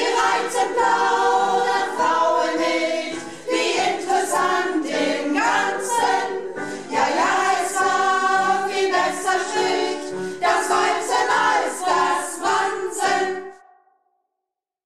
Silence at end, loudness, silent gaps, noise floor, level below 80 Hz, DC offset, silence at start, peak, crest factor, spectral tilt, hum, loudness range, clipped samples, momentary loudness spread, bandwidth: 1.3 s; -20 LUFS; none; -83 dBFS; -64 dBFS; 0.4%; 0 s; -8 dBFS; 14 dB; -2 dB/octave; none; 2 LU; under 0.1%; 7 LU; 14.5 kHz